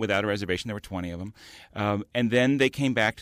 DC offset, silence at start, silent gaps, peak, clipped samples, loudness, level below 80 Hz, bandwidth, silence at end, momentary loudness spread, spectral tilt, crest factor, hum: under 0.1%; 0 s; none; -10 dBFS; under 0.1%; -26 LUFS; -56 dBFS; 15.5 kHz; 0 s; 14 LU; -5.5 dB/octave; 16 dB; none